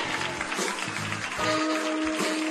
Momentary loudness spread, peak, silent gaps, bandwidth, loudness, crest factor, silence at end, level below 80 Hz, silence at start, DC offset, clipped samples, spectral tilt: 4 LU; -12 dBFS; none; 13 kHz; -28 LUFS; 16 dB; 0 s; -58 dBFS; 0 s; under 0.1%; under 0.1%; -3 dB/octave